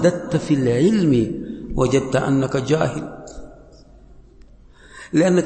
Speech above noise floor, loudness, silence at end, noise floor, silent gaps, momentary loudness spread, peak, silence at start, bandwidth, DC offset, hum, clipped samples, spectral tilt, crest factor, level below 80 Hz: 28 dB; -19 LUFS; 0 s; -46 dBFS; none; 19 LU; -2 dBFS; 0 s; 8.8 kHz; under 0.1%; none; under 0.1%; -6.5 dB/octave; 18 dB; -40 dBFS